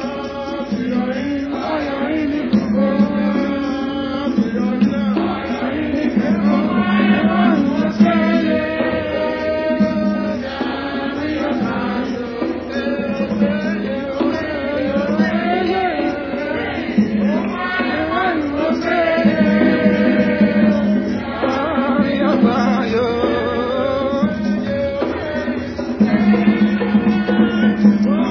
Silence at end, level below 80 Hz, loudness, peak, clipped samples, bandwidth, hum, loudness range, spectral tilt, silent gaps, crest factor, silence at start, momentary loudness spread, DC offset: 0 s; -42 dBFS; -17 LUFS; -2 dBFS; under 0.1%; 5.4 kHz; none; 5 LU; -7.5 dB/octave; none; 16 dB; 0 s; 8 LU; under 0.1%